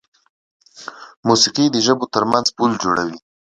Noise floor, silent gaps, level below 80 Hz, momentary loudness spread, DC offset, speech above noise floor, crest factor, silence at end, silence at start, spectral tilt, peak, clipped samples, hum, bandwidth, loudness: -37 dBFS; 1.17-1.23 s; -58 dBFS; 21 LU; under 0.1%; 20 dB; 18 dB; 0.35 s; 0.75 s; -3.5 dB/octave; 0 dBFS; under 0.1%; none; 11 kHz; -17 LUFS